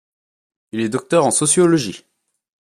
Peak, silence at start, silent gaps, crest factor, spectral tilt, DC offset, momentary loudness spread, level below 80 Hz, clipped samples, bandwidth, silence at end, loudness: -2 dBFS; 0.75 s; none; 16 dB; -4 dB/octave; under 0.1%; 13 LU; -62 dBFS; under 0.1%; 13 kHz; 0.75 s; -16 LUFS